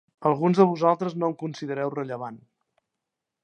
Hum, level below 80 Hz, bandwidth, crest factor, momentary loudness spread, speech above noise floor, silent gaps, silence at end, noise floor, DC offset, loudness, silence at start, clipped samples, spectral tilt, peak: none; -76 dBFS; 8.6 kHz; 22 dB; 14 LU; 61 dB; none; 1.05 s; -85 dBFS; under 0.1%; -24 LUFS; 0.2 s; under 0.1%; -8 dB/octave; -4 dBFS